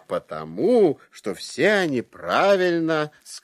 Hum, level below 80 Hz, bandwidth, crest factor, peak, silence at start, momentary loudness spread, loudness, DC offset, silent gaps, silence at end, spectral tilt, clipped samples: none; -64 dBFS; 14.5 kHz; 16 dB; -6 dBFS; 0.1 s; 13 LU; -22 LUFS; under 0.1%; none; 0.05 s; -5 dB/octave; under 0.1%